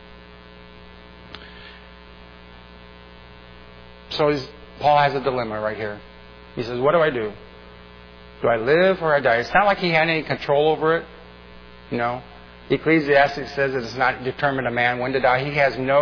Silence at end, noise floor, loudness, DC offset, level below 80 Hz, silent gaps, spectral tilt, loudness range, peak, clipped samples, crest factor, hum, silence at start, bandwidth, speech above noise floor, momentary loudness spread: 0 s; -44 dBFS; -20 LUFS; under 0.1%; -50 dBFS; none; -6.5 dB/octave; 6 LU; -6 dBFS; under 0.1%; 18 dB; 60 Hz at -45 dBFS; 0 s; 5.4 kHz; 24 dB; 19 LU